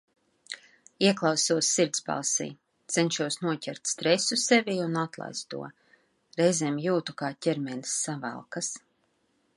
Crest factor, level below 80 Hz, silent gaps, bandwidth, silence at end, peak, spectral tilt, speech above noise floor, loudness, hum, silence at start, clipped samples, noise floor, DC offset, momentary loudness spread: 22 dB; -78 dBFS; none; 11.5 kHz; 0.8 s; -8 dBFS; -3 dB/octave; 44 dB; -27 LUFS; none; 0.5 s; under 0.1%; -72 dBFS; under 0.1%; 15 LU